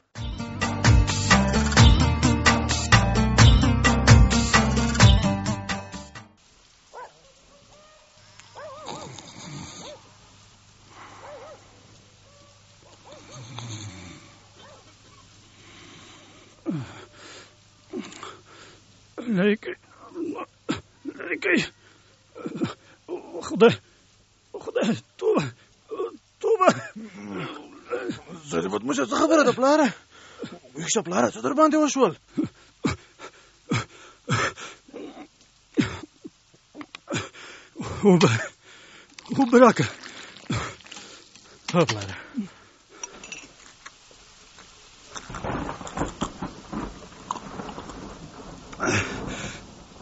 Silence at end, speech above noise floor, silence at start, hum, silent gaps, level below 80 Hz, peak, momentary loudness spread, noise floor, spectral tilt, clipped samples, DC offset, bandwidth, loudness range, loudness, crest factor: 0.2 s; 39 dB; 0.15 s; none; none; -34 dBFS; -2 dBFS; 25 LU; -59 dBFS; -5 dB/octave; under 0.1%; under 0.1%; 8 kHz; 23 LU; -23 LUFS; 24 dB